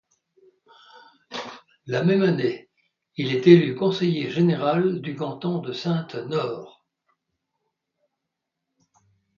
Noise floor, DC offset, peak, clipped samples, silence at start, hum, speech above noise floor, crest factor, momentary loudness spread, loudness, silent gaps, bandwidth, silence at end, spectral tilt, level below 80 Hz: -82 dBFS; under 0.1%; 0 dBFS; under 0.1%; 1.3 s; none; 61 dB; 24 dB; 20 LU; -22 LUFS; none; 7 kHz; 2.7 s; -7.5 dB/octave; -70 dBFS